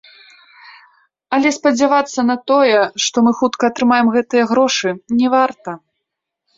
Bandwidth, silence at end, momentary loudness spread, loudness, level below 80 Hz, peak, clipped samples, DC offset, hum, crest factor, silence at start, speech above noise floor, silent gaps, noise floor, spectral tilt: 7.8 kHz; 0.8 s; 6 LU; -15 LUFS; -62 dBFS; -2 dBFS; under 0.1%; under 0.1%; none; 14 dB; 1.3 s; 64 dB; none; -78 dBFS; -3.5 dB/octave